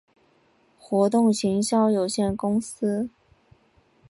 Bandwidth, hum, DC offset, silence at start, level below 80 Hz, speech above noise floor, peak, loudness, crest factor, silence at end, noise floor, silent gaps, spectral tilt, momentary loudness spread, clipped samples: 11.5 kHz; none; under 0.1%; 0.9 s; -56 dBFS; 40 dB; -8 dBFS; -23 LUFS; 16 dB; 1 s; -62 dBFS; none; -5.5 dB/octave; 7 LU; under 0.1%